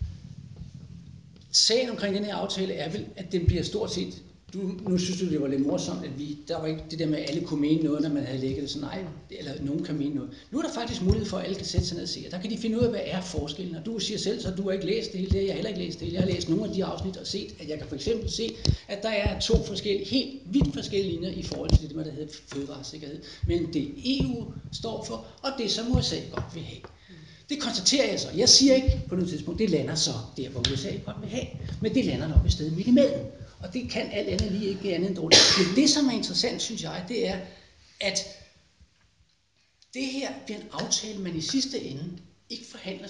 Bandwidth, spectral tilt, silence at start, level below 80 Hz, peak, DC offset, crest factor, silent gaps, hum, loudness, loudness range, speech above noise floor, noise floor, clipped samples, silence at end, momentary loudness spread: 11 kHz; -4 dB/octave; 0 s; -40 dBFS; -4 dBFS; under 0.1%; 24 dB; none; none; -27 LUFS; 9 LU; 41 dB; -68 dBFS; under 0.1%; 0 s; 15 LU